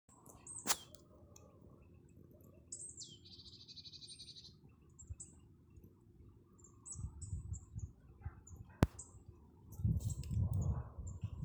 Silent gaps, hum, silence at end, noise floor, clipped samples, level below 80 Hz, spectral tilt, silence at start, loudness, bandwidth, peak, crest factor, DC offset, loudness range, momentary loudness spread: none; none; 0 s; -63 dBFS; under 0.1%; -52 dBFS; -4.5 dB/octave; 0.1 s; -44 LUFS; over 20 kHz; -12 dBFS; 34 dB; under 0.1%; 13 LU; 25 LU